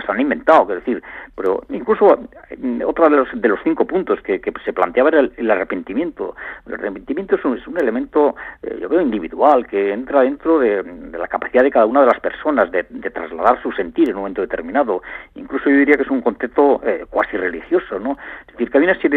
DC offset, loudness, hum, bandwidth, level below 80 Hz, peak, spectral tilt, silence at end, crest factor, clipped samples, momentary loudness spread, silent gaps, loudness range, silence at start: under 0.1%; -17 LUFS; none; 4.5 kHz; -50 dBFS; 0 dBFS; -7.5 dB/octave; 0 s; 18 dB; under 0.1%; 13 LU; none; 3 LU; 0 s